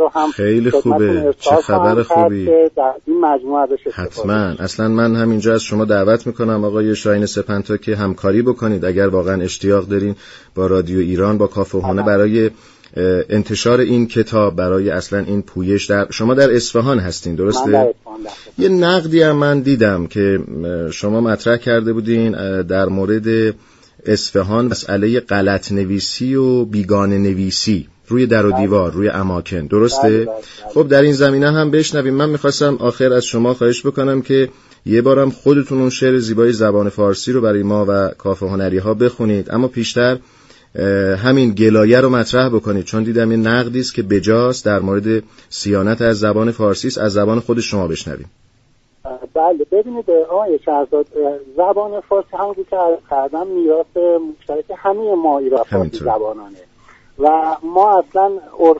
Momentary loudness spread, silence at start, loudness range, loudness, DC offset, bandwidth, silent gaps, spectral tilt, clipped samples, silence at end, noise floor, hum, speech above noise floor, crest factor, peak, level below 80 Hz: 7 LU; 0 s; 3 LU; -15 LUFS; under 0.1%; 8 kHz; none; -6 dB/octave; under 0.1%; 0 s; -54 dBFS; none; 40 dB; 14 dB; 0 dBFS; -46 dBFS